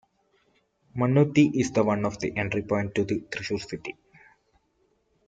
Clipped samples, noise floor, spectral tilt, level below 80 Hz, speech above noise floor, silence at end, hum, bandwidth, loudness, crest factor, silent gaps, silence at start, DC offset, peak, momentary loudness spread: under 0.1%; -70 dBFS; -6.5 dB/octave; -60 dBFS; 45 dB; 1.35 s; none; 9 kHz; -26 LUFS; 20 dB; none; 0.95 s; under 0.1%; -8 dBFS; 14 LU